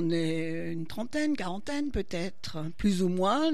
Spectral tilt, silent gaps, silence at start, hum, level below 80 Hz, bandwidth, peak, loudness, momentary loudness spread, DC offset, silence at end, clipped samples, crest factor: -6 dB/octave; none; 0 s; none; -48 dBFS; 13.5 kHz; -16 dBFS; -31 LUFS; 9 LU; 2%; 0 s; under 0.1%; 14 dB